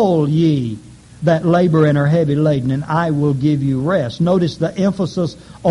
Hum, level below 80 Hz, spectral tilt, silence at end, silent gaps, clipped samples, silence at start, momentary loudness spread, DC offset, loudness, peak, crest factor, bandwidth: none; -46 dBFS; -8 dB/octave; 0 s; none; under 0.1%; 0 s; 7 LU; under 0.1%; -16 LUFS; -2 dBFS; 12 dB; 11 kHz